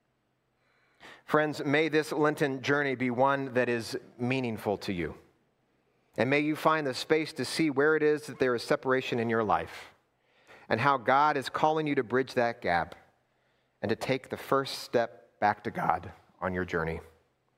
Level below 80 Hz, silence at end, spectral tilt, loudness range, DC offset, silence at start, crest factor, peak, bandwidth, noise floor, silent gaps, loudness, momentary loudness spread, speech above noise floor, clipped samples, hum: -62 dBFS; 0.55 s; -5.5 dB/octave; 4 LU; under 0.1%; 1.05 s; 22 dB; -8 dBFS; 16 kHz; -75 dBFS; none; -29 LUFS; 9 LU; 46 dB; under 0.1%; none